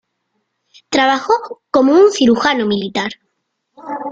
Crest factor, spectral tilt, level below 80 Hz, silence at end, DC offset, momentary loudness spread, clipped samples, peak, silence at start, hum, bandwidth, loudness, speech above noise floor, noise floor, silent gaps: 14 dB; -4 dB/octave; -56 dBFS; 0 s; under 0.1%; 13 LU; under 0.1%; -2 dBFS; 0.9 s; none; 9 kHz; -14 LUFS; 57 dB; -71 dBFS; none